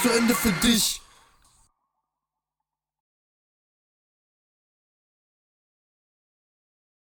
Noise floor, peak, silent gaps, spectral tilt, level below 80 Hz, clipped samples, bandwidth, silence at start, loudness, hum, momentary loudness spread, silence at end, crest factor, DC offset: -87 dBFS; -8 dBFS; none; -3 dB/octave; -50 dBFS; under 0.1%; 19 kHz; 0 s; -21 LUFS; none; 6 LU; 6.15 s; 24 dB; under 0.1%